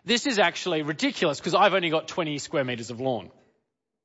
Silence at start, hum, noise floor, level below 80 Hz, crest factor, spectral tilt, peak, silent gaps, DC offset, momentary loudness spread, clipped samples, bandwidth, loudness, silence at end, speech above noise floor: 0.05 s; none; -77 dBFS; -70 dBFS; 18 dB; -4 dB/octave; -8 dBFS; none; under 0.1%; 9 LU; under 0.1%; 8 kHz; -25 LUFS; 0.75 s; 52 dB